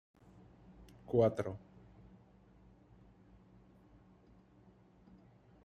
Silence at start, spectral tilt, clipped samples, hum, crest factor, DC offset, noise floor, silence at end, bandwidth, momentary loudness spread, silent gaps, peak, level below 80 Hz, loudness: 0.8 s; -8.5 dB/octave; under 0.1%; none; 26 dB; under 0.1%; -64 dBFS; 4.05 s; 11.5 kHz; 31 LU; none; -18 dBFS; -68 dBFS; -35 LUFS